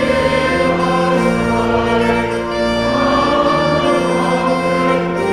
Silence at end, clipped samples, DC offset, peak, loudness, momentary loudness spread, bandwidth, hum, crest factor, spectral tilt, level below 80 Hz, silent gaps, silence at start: 0 s; under 0.1%; under 0.1%; -2 dBFS; -15 LUFS; 3 LU; 13.5 kHz; none; 12 dB; -6 dB/octave; -34 dBFS; none; 0 s